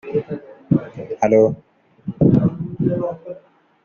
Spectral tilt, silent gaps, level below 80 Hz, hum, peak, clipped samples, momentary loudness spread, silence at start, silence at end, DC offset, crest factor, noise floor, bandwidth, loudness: -10.5 dB/octave; none; -48 dBFS; none; -2 dBFS; under 0.1%; 19 LU; 0.05 s; 0.45 s; under 0.1%; 16 dB; -49 dBFS; 7 kHz; -19 LUFS